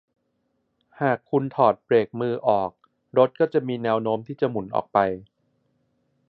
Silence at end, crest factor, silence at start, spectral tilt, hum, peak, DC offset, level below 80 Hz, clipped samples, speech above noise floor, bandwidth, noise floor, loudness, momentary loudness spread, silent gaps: 1.05 s; 20 dB; 1 s; -10 dB/octave; none; -4 dBFS; under 0.1%; -64 dBFS; under 0.1%; 50 dB; 4.8 kHz; -73 dBFS; -23 LUFS; 7 LU; none